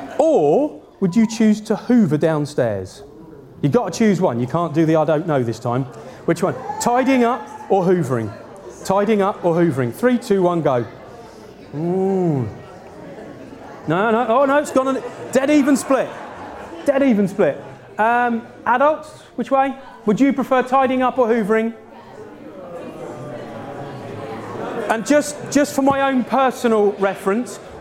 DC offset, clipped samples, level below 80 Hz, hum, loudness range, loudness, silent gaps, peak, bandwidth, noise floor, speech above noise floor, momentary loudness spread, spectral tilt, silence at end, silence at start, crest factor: under 0.1%; under 0.1%; -56 dBFS; none; 5 LU; -18 LUFS; none; -2 dBFS; 16 kHz; -40 dBFS; 23 dB; 17 LU; -6.5 dB/octave; 0 s; 0 s; 18 dB